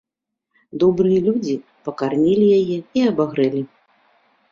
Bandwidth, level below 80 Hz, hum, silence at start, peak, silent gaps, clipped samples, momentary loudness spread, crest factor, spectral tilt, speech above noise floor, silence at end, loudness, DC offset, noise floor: 7.4 kHz; -58 dBFS; none; 0.75 s; -4 dBFS; none; under 0.1%; 12 LU; 14 dB; -8 dB/octave; 63 dB; 0.85 s; -18 LUFS; under 0.1%; -81 dBFS